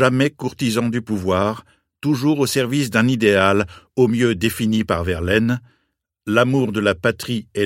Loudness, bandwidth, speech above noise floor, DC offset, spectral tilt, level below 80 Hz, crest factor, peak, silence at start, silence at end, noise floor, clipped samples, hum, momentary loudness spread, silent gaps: -19 LUFS; 16.5 kHz; 53 dB; under 0.1%; -5.5 dB/octave; -46 dBFS; 18 dB; 0 dBFS; 0 s; 0 s; -71 dBFS; under 0.1%; none; 8 LU; none